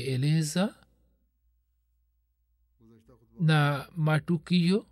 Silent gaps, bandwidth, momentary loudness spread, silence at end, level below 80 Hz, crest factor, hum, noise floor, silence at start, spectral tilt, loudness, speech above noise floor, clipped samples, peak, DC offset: none; 13.5 kHz; 6 LU; 0.1 s; -66 dBFS; 14 dB; none; -73 dBFS; 0 s; -6 dB/octave; -27 LUFS; 47 dB; under 0.1%; -14 dBFS; under 0.1%